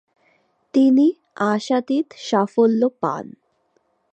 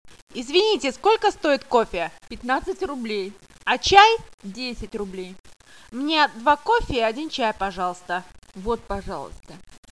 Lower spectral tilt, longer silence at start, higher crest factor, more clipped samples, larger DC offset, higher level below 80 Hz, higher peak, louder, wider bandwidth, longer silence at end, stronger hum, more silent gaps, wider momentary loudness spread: first, -6 dB/octave vs -3.5 dB/octave; first, 0.75 s vs 0.35 s; second, 16 dB vs 24 dB; neither; second, under 0.1% vs 0.3%; second, -74 dBFS vs -44 dBFS; second, -4 dBFS vs 0 dBFS; first, -19 LUFS vs -22 LUFS; second, 8.6 kHz vs 11 kHz; first, 0.85 s vs 0.35 s; neither; second, none vs 4.34-4.38 s, 5.40-5.44 s; second, 10 LU vs 17 LU